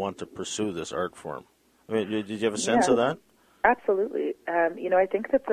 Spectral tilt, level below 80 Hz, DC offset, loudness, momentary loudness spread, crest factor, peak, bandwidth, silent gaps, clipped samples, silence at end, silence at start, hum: -4 dB/octave; -62 dBFS; under 0.1%; -26 LUFS; 11 LU; 20 dB; -6 dBFS; 15 kHz; none; under 0.1%; 0 s; 0 s; none